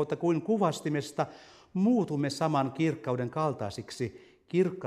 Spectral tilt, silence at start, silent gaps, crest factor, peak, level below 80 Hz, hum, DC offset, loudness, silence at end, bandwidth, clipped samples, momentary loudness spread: -6.5 dB/octave; 0 s; none; 18 dB; -12 dBFS; -68 dBFS; none; under 0.1%; -30 LUFS; 0 s; 14.5 kHz; under 0.1%; 10 LU